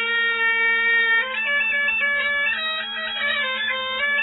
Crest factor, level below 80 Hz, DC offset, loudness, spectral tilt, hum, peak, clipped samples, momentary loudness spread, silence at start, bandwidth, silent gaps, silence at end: 12 dB; -60 dBFS; under 0.1%; -19 LUFS; -3 dB/octave; none; -10 dBFS; under 0.1%; 6 LU; 0 s; 4.1 kHz; none; 0 s